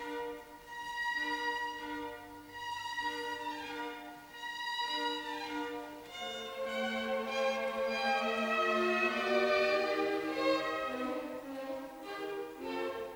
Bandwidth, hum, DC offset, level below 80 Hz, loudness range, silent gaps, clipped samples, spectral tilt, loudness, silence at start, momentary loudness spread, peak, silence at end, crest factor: over 20 kHz; none; under 0.1%; -70 dBFS; 7 LU; none; under 0.1%; -3 dB/octave; -35 LUFS; 0 s; 14 LU; -18 dBFS; 0 s; 18 dB